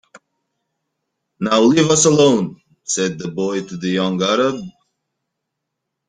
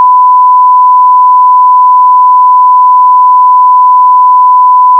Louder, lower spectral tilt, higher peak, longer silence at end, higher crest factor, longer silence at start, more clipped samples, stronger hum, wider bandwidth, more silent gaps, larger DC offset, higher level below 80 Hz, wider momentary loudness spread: second, -16 LUFS vs -3 LUFS; first, -4 dB/octave vs 1 dB/octave; about the same, -2 dBFS vs 0 dBFS; first, 1.4 s vs 0 s; first, 18 dB vs 2 dB; first, 1.4 s vs 0 s; second, under 0.1% vs 6%; neither; first, 9.6 kHz vs 1.1 kHz; neither; neither; first, -60 dBFS vs under -90 dBFS; first, 14 LU vs 0 LU